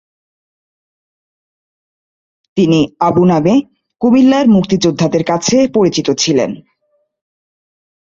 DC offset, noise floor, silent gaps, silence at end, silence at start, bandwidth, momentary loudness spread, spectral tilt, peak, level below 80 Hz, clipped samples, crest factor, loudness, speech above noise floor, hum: under 0.1%; -63 dBFS; none; 1.4 s; 2.55 s; 7.8 kHz; 6 LU; -5.5 dB/octave; 0 dBFS; -50 dBFS; under 0.1%; 14 dB; -12 LUFS; 52 dB; none